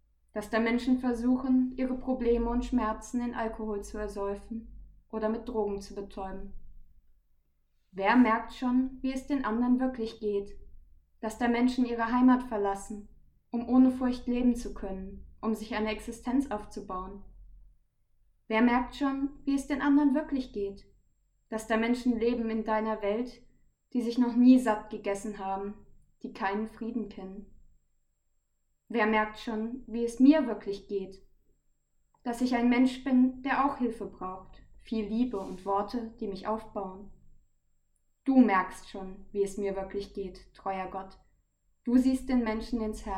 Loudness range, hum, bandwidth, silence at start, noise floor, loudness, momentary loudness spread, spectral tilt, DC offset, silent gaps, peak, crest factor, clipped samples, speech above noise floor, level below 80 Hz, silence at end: 7 LU; none; 11.5 kHz; 0.35 s; -75 dBFS; -30 LUFS; 16 LU; -6 dB/octave; under 0.1%; none; -10 dBFS; 20 dB; under 0.1%; 46 dB; -50 dBFS; 0 s